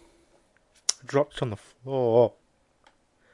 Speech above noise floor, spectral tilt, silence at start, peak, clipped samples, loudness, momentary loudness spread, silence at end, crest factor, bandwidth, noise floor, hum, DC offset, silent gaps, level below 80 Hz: 39 dB; -4.5 dB/octave; 0.9 s; 0 dBFS; under 0.1%; -26 LUFS; 11 LU; 1.05 s; 28 dB; 11.5 kHz; -64 dBFS; none; under 0.1%; none; -64 dBFS